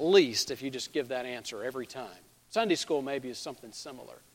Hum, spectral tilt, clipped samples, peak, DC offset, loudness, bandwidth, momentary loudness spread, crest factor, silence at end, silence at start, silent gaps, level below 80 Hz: none; -3.5 dB/octave; under 0.1%; -8 dBFS; under 0.1%; -32 LUFS; 16.5 kHz; 15 LU; 24 dB; 0.15 s; 0 s; none; -72 dBFS